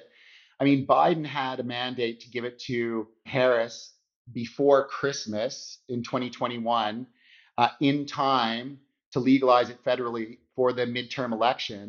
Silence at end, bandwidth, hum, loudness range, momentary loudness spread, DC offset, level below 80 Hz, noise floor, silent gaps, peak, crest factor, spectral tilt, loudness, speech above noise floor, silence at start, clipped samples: 0 s; 7.2 kHz; none; 3 LU; 13 LU; under 0.1%; -72 dBFS; -56 dBFS; 4.16-4.25 s, 9.06-9.12 s; -4 dBFS; 22 dB; -3.5 dB/octave; -26 LUFS; 30 dB; 0.6 s; under 0.1%